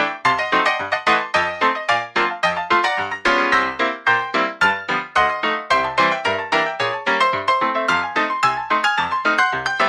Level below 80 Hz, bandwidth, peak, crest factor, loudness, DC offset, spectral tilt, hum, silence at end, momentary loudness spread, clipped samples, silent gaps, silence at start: -54 dBFS; 12 kHz; -4 dBFS; 16 dB; -18 LUFS; under 0.1%; -3 dB/octave; none; 0 s; 3 LU; under 0.1%; none; 0 s